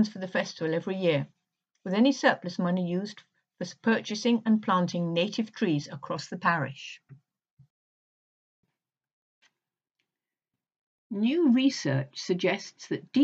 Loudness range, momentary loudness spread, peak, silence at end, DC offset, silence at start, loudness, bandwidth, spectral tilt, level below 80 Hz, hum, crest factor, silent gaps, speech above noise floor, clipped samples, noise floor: 8 LU; 14 LU; -8 dBFS; 0 s; under 0.1%; 0 s; -28 LUFS; 8 kHz; -5.5 dB/octave; -82 dBFS; none; 22 dB; 7.51-7.57 s, 7.70-8.63 s, 9.13-9.41 s, 10.79-11.10 s; 63 dB; under 0.1%; -90 dBFS